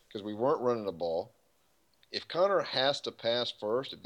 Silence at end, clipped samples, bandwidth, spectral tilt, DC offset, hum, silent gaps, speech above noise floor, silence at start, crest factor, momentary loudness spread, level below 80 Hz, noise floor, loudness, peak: 0.05 s; under 0.1%; 11 kHz; -4.5 dB/octave; under 0.1%; none; none; 40 dB; 0.1 s; 18 dB; 11 LU; -76 dBFS; -72 dBFS; -32 LUFS; -14 dBFS